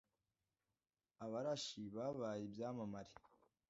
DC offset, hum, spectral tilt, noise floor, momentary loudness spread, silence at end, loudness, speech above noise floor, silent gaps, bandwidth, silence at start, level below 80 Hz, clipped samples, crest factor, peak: under 0.1%; none; -5 dB/octave; under -90 dBFS; 11 LU; 0.5 s; -47 LUFS; over 43 dB; none; 7.6 kHz; 1.2 s; -82 dBFS; under 0.1%; 18 dB; -32 dBFS